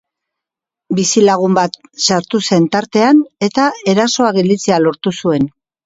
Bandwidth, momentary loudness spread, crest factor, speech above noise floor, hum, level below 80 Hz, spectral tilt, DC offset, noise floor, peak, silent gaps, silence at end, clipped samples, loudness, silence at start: 8 kHz; 6 LU; 14 dB; 71 dB; none; -56 dBFS; -4.5 dB/octave; under 0.1%; -84 dBFS; 0 dBFS; none; 0.35 s; under 0.1%; -13 LUFS; 0.9 s